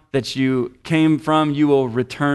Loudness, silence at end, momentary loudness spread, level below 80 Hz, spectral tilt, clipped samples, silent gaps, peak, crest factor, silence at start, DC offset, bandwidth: -18 LUFS; 0 s; 7 LU; -54 dBFS; -6.5 dB/octave; under 0.1%; none; -6 dBFS; 12 dB; 0.15 s; under 0.1%; 12 kHz